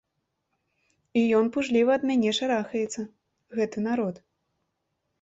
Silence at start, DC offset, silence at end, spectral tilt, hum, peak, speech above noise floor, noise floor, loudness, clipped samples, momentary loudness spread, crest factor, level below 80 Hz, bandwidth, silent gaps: 1.15 s; under 0.1%; 1.05 s; -5 dB/octave; none; -12 dBFS; 54 dB; -79 dBFS; -26 LUFS; under 0.1%; 11 LU; 16 dB; -68 dBFS; 8 kHz; none